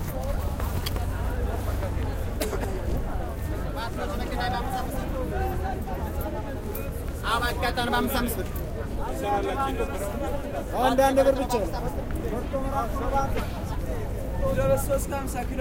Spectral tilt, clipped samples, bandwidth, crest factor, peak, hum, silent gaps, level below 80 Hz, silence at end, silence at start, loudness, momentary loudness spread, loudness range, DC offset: -5.5 dB/octave; under 0.1%; 17 kHz; 18 dB; -8 dBFS; none; none; -32 dBFS; 0 s; 0 s; -28 LUFS; 8 LU; 5 LU; under 0.1%